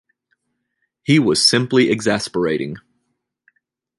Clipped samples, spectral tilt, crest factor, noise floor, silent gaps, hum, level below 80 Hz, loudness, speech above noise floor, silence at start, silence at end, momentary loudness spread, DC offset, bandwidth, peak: under 0.1%; -4 dB/octave; 18 dB; -73 dBFS; none; none; -56 dBFS; -16 LUFS; 56 dB; 1.1 s; 1.2 s; 16 LU; under 0.1%; 11.5 kHz; -2 dBFS